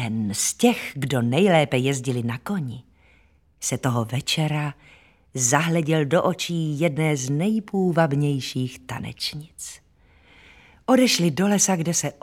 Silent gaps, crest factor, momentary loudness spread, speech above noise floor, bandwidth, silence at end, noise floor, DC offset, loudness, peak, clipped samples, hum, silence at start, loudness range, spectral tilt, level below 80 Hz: none; 22 dB; 13 LU; 36 dB; 17 kHz; 0.1 s; -58 dBFS; under 0.1%; -22 LUFS; -2 dBFS; under 0.1%; none; 0 s; 4 LU; -4.5 dB/octave; -58 dBFS